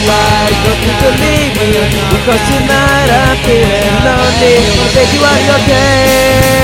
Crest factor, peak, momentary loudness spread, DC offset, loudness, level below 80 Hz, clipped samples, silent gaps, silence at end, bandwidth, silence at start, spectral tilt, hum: 8 dB; 0 dBFS; 3 LU; under 0.1%; -8 LUFS; -20 dBFS; 0.3%; none; 0 s; 17 kHz; 0 s; -4.5 dB/octave; none